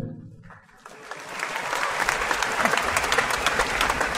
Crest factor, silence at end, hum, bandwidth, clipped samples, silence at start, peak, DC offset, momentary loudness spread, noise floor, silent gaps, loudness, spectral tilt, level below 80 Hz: 22 dB; 0 s; none; 16 kHz; under 0.1%; 0 s; -4 dBFS; under 0.1%; 16 LU; -48 dBFS; none; -23 LUFS; -2 dB/octave; -46 dBFS